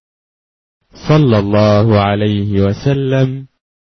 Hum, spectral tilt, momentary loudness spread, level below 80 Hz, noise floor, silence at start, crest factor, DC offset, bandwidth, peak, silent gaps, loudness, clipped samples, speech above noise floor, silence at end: none; -8 dB/octave; 6 LU; -42 dBFS; under -90 dBFS; 0.95 s; 12 dB; under 0.1%; 6.4 kHz; -2 dBFS; none; -13 LUFS; under 0.1%; over 78 dB; 0.45 s